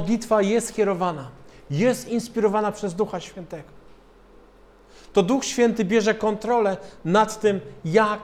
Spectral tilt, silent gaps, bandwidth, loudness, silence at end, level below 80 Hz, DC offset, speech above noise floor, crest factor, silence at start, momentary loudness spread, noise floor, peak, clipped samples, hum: -5 dB/octave; none; 15 kHz; -23 LUFS; 0 s; -54 dBFS; under 0.1%; 29 dB; 18 dB; 0 s; 12 LU; -51 dBFS; -4 dBFS; under 0.1%; none